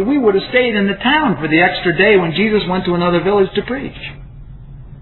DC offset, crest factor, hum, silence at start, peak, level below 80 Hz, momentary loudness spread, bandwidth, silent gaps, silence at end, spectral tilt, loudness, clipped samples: under 0.1%; 14 dB; none; 0 s; 0 dBFS; -38 dBFS; 12 LU; 4.3 kHz; none; 0 s; -9 dB/octave; -14 LUFS; under 0.1%